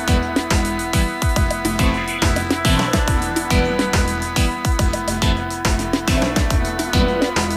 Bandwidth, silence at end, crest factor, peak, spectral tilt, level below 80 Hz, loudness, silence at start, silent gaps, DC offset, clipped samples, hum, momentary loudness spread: 16 kHz; 0 s; 12 dB; -6 dBFS; -4.5 dB/octave; -24 dBFS; -19 LUFS; 0 s; none; under 0.1%; under 0.1%; none; 3 LU